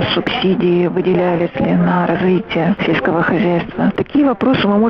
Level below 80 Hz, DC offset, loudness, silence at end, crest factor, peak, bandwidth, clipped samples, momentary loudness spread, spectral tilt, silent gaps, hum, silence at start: -44 dBFS; under 0.1%; -15 LUFS; 0 s; 10 dB; -4 dBFS; 5.8 kHz; under 0.1%; 3 LU; -9 dB/octave; none; none; 0 s